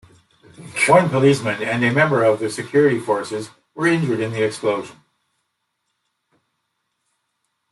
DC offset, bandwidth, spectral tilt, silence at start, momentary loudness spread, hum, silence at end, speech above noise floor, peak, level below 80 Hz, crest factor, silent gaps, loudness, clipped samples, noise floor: under 0.1%; 12.5 kHz; -5.5 dB/octave; 0.6 s; 14 LU; none; 2.8 s; 56 dB; -2 dBFS; -62 dBFS; 20 dB; none; -18 LUFS; under 0.1%; -74 dBFS